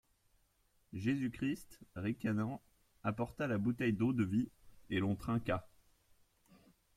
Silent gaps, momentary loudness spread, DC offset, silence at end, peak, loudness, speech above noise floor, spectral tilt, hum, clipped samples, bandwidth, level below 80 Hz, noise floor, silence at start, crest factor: none; 9 LU; under 0.1%; 1.3 s; -20 dBFS; -38 LUFS; 38 dB; -7.5 dB/octave; none; under 0.1%; 15.5 kHz; -64 dBFS; -75 dBFS; 0.9 s; 18 dB